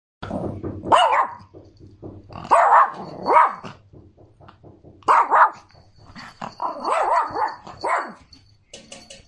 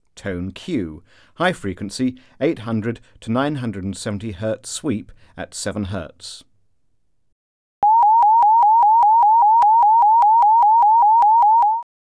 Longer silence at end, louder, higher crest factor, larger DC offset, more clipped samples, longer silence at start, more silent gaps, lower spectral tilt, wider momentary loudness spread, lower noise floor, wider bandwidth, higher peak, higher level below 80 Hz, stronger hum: second, 0.15 s vs 0.3 s; second, -19 LUFS vs -16 LUFS; first, 20 dB vs 12 dB; neither; neither; about the same, 0.2 s vs 0.25 s; second, none vs 7.32-7.82 s; about the same, -4 dB/octave vs -5 dB/octave; first, 25 LU vs 16 LU; second, -52 dBFS vs -70 dBFS; about the same, 10.5 kHz vs 11 kHz; first, -2 dBFS vs -6 dBFS; about the same, -56 dBFS vs -52 dBFS; neither